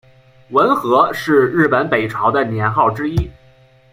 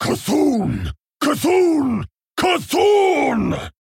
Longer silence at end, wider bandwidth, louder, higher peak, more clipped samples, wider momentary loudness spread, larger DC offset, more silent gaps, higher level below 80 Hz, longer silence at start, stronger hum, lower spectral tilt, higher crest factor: first, 0.6 s vs 0.15 s; about the same, 16 kHz vs 17 kHz; first, -15 LUFS vs -18 LUFS; first, 0 dBFS vs -4 dBFS; neither; second, 7 LU vs 10 LU; neither; neither; about the same, -38 dBFS vs -42 dBFS; first, 0.5 s vs 0 s; neither; first, -7 dB/octave vs -5 dB/octave; about the same, 16 dB vs 14 dB